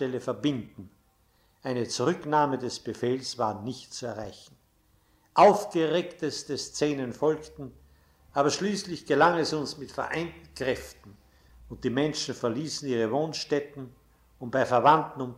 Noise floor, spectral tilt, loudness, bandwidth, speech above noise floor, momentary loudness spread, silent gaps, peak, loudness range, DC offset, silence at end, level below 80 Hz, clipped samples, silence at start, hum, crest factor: -66 dBFS; -4.5 dB/octave; -28 LUFS; 15.5 kHz; 38 dB; 17 LU; none; -8 dBFS; 5 LU; under 0.1%; 0 s; -60 dBFS; under 0.1%; 0 s; none; 20 dB